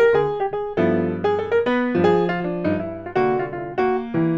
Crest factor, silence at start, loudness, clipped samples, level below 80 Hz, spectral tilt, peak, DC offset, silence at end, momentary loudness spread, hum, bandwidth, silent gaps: 16 dB; 0 s; -21 LUFS; under 0.1%; -50 dBFS; -8.5 dB/octave; -4 dBFS; under 0.1%; 0 s; 6 LU; none; 7.6 kHz; none